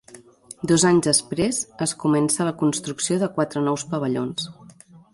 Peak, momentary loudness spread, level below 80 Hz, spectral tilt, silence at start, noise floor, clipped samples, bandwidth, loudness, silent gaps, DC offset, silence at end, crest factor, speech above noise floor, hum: -6 dBFS; 9 LU; -58 dBFS; -4 dB/octave; 0.15 s; -48 dBFS; under 0.1%; 11.5 kHz; -22 LUFS; none; under 0.1%; 0.6 s; 16 dB; 26 dB; none